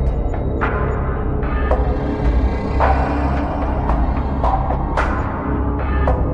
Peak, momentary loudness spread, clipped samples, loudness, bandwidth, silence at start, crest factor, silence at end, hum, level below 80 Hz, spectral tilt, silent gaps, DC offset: -4 dBFS; 4 LU; under 0.1%; -20 LUFS; 5.8 kHz; 0 s; 14 dB; 0 s; none; -20 dBFS; -9 dB/octave; none; 0.2%